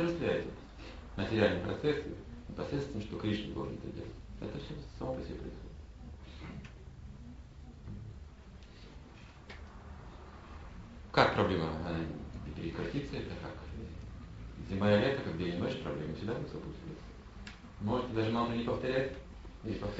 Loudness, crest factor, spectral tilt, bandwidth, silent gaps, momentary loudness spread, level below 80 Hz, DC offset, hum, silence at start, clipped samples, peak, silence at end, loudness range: -36 LUFS; 26 dB; -5 dB/octave; 8 kHz; none; 21 LU; -50 dBFS; under 0.1%; none; 0 s; under 0.1%; -10 dBFS; 0 s; 16 LU